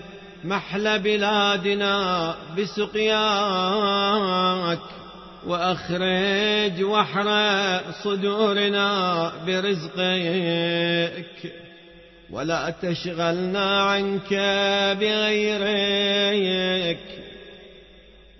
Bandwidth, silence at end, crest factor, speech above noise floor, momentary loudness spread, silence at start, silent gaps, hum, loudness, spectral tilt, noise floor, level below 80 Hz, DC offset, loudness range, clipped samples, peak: 6.2 kHz; 0.4 s; 16 dB; 26 dB; 11 LU; 0 s; none; none; -22 LUFS; -4.5 dB/octave; -49 dBFS; -56 dBFS; under 0.1%; 4 LU; under 0.1%; -8 dBFS